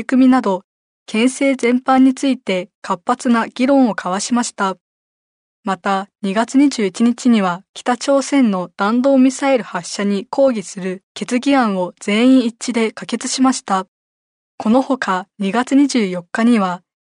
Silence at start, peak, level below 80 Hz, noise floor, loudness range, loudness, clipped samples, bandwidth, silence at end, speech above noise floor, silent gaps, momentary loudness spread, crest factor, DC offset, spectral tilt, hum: 0 s; -4 dBFS; -66 dBFS; under -90 dBFS; 3 LU; -16 LUFS; under 0.1%; 11 kHz; 0.3 s; over 74 dB; 0.64-1.06 s, 2.75-2.82 s, 4.81-5.63 s, 7.69-7.74 s, 11.03-11.15 s, 13.88-14.58 s; 10 LU; 14 dB; under 0.1%; -4.5 dB/octave; none